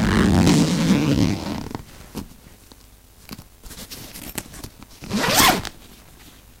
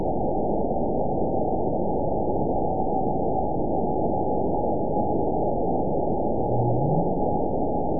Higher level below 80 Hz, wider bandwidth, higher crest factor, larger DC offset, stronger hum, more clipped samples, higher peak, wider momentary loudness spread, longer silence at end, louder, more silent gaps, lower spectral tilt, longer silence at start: about the same, -38 dBFS vs -38 dBFS; first, 17 kHz vs 1 kHz; first, 22 dB vs 14 dB; second, under 0.1% vs 4%; neither; neither; first, 0 dBFS vs -10 dBFS; first, 25 LU vs 2 LU; first, 0.85 s vs 0 s; first, -19 LUFS vs -25 LUFS; neither; second, -4.5 dB/octave vs -18.5 dB/octave; about the same, 0 s vs 0 s